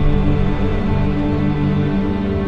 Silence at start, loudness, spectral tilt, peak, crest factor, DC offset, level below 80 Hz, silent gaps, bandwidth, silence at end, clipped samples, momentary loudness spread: 0 s; -18 LUFS; -9.5 dB/octave; -4 dBFS; 12 dB; under 0.1%; -22 dBFS; none; 6 kHz; 0 s; under 0.1%; 2 LU